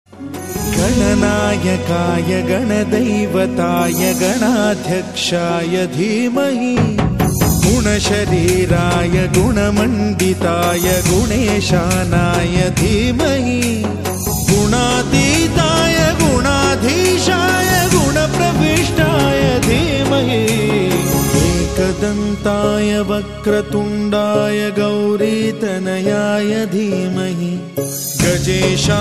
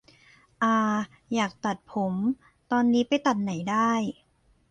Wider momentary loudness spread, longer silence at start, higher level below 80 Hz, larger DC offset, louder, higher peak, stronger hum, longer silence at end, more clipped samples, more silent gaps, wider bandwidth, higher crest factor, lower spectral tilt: second, 5 LU vs 8 LU; second, 0.15 s vs 0.6 s; first, -30 dBFS vs -66 dBFS; first, 0.3% vs under 0.1%; first, -15 LUFS vs -26 LUFS; first, 0 dBFS vs -10 dBFS; neither; second, 0 s vs 0.6 s; neither; neither; first, 14 kHz vs 9 kHz; about the same, 14 dB vs 16 dB; about the same, -5 dB/octave vs -5.5 dB/octave